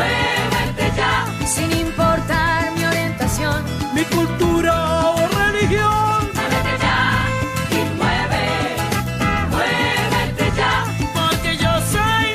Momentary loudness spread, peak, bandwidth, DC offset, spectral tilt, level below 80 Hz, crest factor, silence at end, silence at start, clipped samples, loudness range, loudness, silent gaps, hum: 4 LU; -4 dBFS; 15.5 kHz; under 0.1%; -4.5 dB/octave; -32 dBFS; 14 dB; 0 s; 0 s; under 0.1%; 2 LU; -18 LUFS; none; none